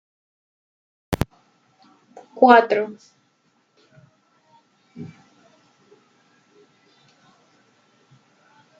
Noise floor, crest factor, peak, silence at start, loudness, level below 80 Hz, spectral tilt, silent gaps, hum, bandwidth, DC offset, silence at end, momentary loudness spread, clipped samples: -65 dBFS; 24 dB; -2 dBFS; 1.1 s; -18 LUFS; -52 dBFS; -6 dB/octave; none; none; 9 kHz; under 0.1%; 3.75 s; 28 LU; under 0.1%